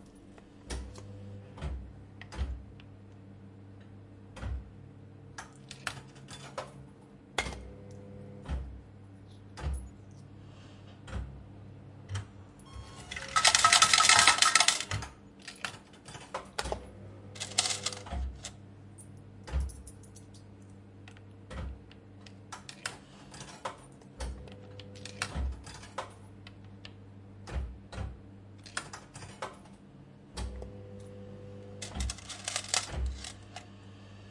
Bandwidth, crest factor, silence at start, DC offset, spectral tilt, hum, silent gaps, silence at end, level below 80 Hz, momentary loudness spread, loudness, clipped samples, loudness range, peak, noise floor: 11.5 kHz; 32 dB; 0 s; under 0.1%; -1 dB/octave; none; none; 0 s; -46 dBFS; 23 LU; -30 LUFS; under 0.1%; 22 LU; -4 dBFS; -53 dBFS